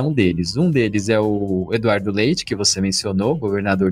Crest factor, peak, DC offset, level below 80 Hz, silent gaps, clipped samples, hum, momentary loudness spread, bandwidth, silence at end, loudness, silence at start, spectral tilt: 16 dB; -4 dBFS; under 0.1%; -46 dBFS; none; under 0.1%; none; 3 LU; 15 kHz; 0 s; -19 LUFS; 0 s; -5 dB/octave